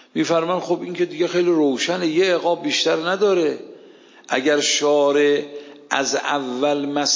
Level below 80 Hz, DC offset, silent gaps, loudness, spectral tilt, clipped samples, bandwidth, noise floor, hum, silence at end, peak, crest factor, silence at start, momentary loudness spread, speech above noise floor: -76 dBFS; under 0.1%; none; -19 LUFS; -3 dB/octave; under 0.1%; 7.6 kHz; -46 dBFS; none; 0 s; -2 dBFS; 16 dB; 0.15 s; 8 LU; 27 dB